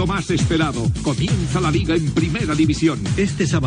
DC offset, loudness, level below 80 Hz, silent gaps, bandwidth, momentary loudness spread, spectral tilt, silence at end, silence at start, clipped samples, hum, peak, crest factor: under 0.1%; -19 LUFS; -34 dBFS; none; 10.5 kHz; 3 LU; -6 dB/octave; 0 s; 0 s; under 0.1%; none; -6 dBFS; 14 dB